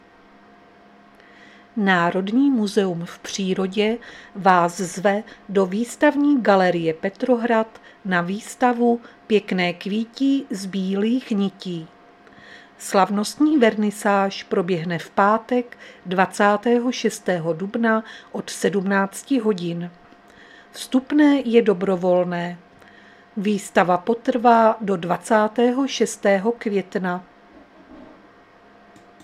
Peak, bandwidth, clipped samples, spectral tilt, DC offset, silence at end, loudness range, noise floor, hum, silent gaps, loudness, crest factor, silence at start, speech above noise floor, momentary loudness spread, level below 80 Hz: 0 dBFS; 14.5 kHz; under 0.1%; -5.5 dB/octave; under 0.1%; 1.2 s; 4 LU; -50 dBFS; none; none; -21 LUFS; 20 dB; 1.75 s; 30 dB; 12 LU; -66 dBFS